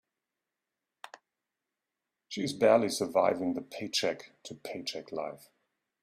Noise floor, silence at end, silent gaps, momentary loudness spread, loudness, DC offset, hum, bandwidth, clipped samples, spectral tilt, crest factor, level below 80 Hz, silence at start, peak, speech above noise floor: -88 dBFS; 0.65 s; none; 23 LU; -30 LUFS; under 0.1%; none; 15 kHz; under 0.1%; -4 dB/octave; 22 dB; -76 dBFS; 2.3 s; -12 dBFS; 58 dB